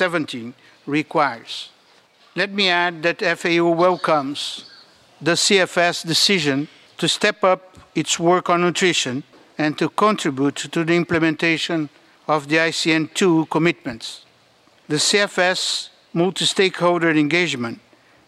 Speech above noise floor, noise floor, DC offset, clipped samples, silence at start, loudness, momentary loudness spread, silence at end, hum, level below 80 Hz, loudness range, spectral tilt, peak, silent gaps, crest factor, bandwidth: 36 dB; -55 dBFS; under 0.1%; under 0.1%; 0 s; -19 LUFS; 14 LU; 0.5 s; none; -64 dBFS; 2 LU; -3.5 dB/octave; 0 dBFS; none; 20 dB; 14.5 kHz